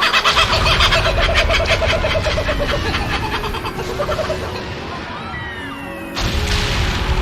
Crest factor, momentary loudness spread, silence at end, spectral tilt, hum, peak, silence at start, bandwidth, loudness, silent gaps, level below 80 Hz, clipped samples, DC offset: 16 dB; 14 LU; 0 s; -4 dB/octave; none; 0 dBFS; 0 s; 16.5 kHz; -17 LUFS; none; -24 dBFS; under 0.1%; under 0.1%